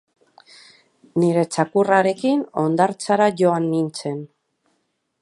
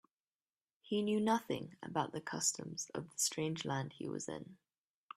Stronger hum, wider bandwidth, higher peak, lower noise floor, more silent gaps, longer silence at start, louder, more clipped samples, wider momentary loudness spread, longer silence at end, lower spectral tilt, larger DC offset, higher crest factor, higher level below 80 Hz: neither; second, 11.5 kHz vs 15.5 kHz; first, -2 dBFS vs -20 dBFS; second, -71 dBFS vs under -90 dBFS; neither; first, 1.15 s vs 0.85 s; first, -20 LUFS vs -38 LUFS; neither; about the same, 10 LU vs 9 LU; first, 0.95 s vs 0.6 s; first, -6 dB/octave vs -3.5 dB/octave; neither; about the same, 18 dB vs 20 dB; first, -72 dBFS vs -78 dBFS